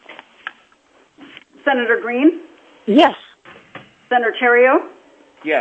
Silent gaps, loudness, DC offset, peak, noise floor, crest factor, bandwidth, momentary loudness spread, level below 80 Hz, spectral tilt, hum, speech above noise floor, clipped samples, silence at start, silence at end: none; -15 LUFS; under 0.1%; 0 dBFS; -54 dBFS; 18 dB; 8.2 kHz; 22 LU; -72 dBFS; -6 dB/octave; none; 40 dB; under 0.1%; 0.1 s; 0 s